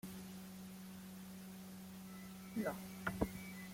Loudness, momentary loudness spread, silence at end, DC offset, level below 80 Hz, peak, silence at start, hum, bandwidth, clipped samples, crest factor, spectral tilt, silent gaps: -48 LUFS; 10 LU; 0 s; under 0.1%; -64 dBFS; -20 dBFS; 0.05 s; none; 16.5 kHz; under 0.1%; 28 dB; -5.5 dB/octave; none